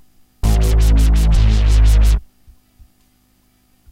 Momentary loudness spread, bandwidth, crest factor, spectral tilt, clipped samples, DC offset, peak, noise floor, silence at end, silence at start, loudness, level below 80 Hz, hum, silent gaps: 5 LU; 13 kHz; 10 dB; -6 dB/octave; under 0.1%; under 0.1%; -4 dBFS; -57 dBFS; 1.75 s; 0.45 s; -15 LUFS; -14 dBFS; 50 Hz at -35 dBFS; none